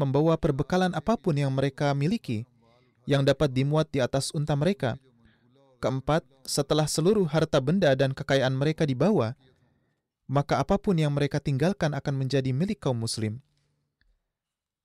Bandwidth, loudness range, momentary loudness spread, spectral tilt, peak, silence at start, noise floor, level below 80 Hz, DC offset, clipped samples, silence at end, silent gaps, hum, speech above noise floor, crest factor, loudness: 13.5 kHz; 4 LU; 7 LU; -6 dB/octave; -12 dBFS; 0 s; -89 dBFS; -52 dBFS; under 0.1%; under 0.1%; 1.45 s; none; none; 63 dB; 14 dB; -26 LUFS